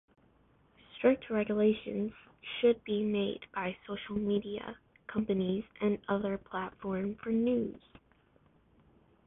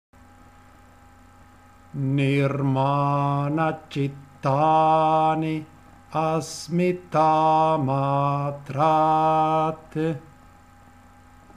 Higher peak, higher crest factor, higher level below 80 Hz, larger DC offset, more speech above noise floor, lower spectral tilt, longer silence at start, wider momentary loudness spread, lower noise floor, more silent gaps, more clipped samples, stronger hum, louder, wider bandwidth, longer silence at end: second, -14 dBFS vs -8 dBFS; about the same, 20 dB vs 16 dB; second, -64 dBFS vs -58 dBFS; neither; first, 34 dB vs 29 dB; first, -10 dB/octave vs -7 dB/octave; second, 0.95 s vs 1.95 s; about the same, 12 LU vs 10 LU; first, -67 dBFS vs -51 dBFS; neither; neither; neither; second, -33 LUFS vs -22 LUFS; second, 3.9 kHz vs 12 kHz; first, 1.5 s vs 1.35 s